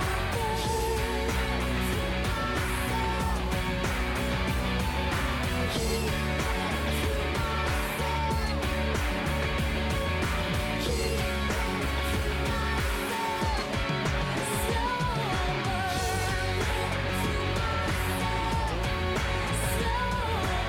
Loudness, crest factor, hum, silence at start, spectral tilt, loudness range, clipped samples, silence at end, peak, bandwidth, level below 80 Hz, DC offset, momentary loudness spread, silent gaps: -29 LUFS; 14 dB; none; 0 s; -4.5 dB/octave; 0 LU; under 0.1%; 0 s; -14 dBFS; 19 kHz; -34 dBFS; under 0.1%; 1 LU; none